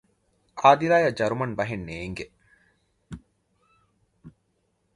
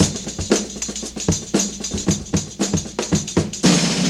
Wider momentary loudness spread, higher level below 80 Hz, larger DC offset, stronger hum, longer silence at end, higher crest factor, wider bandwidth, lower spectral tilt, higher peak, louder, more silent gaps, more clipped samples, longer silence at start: first, 26 LU vs 8 LU; second, -56 dBFS vs -38 dBFS; neither; neither; first, 0.65 s vs 0 s; first, 26 dB vs 20 dB; second, 11.5 kHz vs 14.5 kHz; first, -6 dB/octave vs -4 dB/octave; about the same, -2 dBFS vs 0 dBFS; second, -23 LUFS vs -20 LUFS; neither; neither; first, 0.55 s vs 0 s